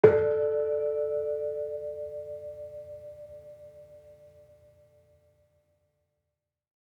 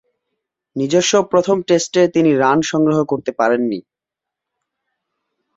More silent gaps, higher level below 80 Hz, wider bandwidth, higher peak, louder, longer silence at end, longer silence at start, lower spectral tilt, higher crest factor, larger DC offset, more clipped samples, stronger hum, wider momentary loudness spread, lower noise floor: neither; second, -68 dBFS vs -60 dBFS; second, 4.1 kHz vs 7.8 kHz; about the same, -4 dBFS vs -2 dBFS; second, -30 LUFS vs -16 LUFS; first, 2.75 s vs 1.75 s; second, 0.05 s vs 0.75 s; first, -9 dB/octave vs -4.5 dB/octave; first, 28 dB vs 16 dB; neither; neither; neither; first, 23 LU vs 8 LU; about the same, -85 dBFS vs -85 dBFS